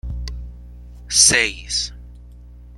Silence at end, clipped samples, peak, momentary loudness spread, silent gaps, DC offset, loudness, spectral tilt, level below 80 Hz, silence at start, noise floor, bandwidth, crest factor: 0 s; under 0.1%; 0 dBFS; 23 LU; none; under 0.1%; -15 LUFS; -0.5 dB/octave; -34 dBFS; 0.05 s; -40 dBFS; 15 kHz; 22 dB